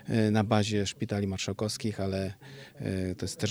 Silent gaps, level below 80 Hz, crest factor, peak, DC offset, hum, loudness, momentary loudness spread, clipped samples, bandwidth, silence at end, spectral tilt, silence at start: none; -62 dBFS; 20 dB; -10 dBFS; under 0.1%; none; -31 LUFS; 12 LU; under 0.1%; 15 kHz; 0 s; -5.5 dB/octave; 0.05 s